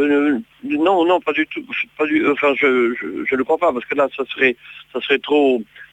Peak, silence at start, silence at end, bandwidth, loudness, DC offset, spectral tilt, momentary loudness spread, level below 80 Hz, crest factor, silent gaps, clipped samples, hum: -2 dBFS; 0 s; 0.1 s; 8.8 kHz; -18 LUFS; under 0.1%; -5.5 dB/octave; 8 LU; -62 dBFS; 18 dB; none; under 0.1%; none